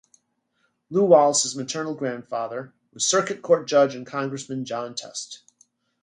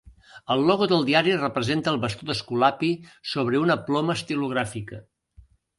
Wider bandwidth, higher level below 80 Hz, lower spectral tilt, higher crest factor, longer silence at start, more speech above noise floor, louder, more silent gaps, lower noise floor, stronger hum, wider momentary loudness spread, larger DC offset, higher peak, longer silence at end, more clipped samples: about the same, 11 kHz vs 11.5 kHz; second, -74 dBFS vs -58 dBFS; second, -3.5 dB/octave vs -5.5 dB/octave; about the same, 20 dB vs 20 dB; first, 0.9 s vs 0.05 s; first, 48 dB vs 31 dB; about the same, -23 LUFS vs -24 LUFS; neither; first, -71 dBFS vs -55 dBFS; neither; first, 17 LU vs 11 LU; neither; about the same, -4 dBFS vs -4 dBFS; second, 0.65 s vs 0.8 s; neither